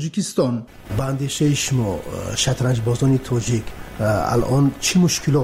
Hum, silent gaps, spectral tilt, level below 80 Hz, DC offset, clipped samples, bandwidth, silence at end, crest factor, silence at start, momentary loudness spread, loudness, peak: none; none; -5 dB/octave; -40 dBFS; under 0.1%; under 0.1%; 16 kHz; 0 s; 12 dB; 0 s; 8 LU; -20 LUFS; -8 dBFS